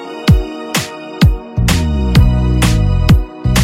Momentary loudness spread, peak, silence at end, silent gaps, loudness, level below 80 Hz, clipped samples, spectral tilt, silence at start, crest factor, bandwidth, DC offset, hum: 7 LU; 0 dBFS; 0 s; none; -13 LUFS; -16 dBFS; under 0.1%; -5.5 dB/octave; 0 s; 12 dB; 16.5 kHz; under 0.1%; none